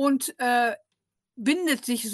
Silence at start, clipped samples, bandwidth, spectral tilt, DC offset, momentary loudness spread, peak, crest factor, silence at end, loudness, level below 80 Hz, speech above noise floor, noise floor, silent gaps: 0 s; under 0.1%; 13 kHz; -2.5 dB/octave; under 0.1%; 6 LU; -10 dBFS; 16 dB; 0 s; -25 LUFS; -78 dBFS; 57 dB; -82 dBFS; none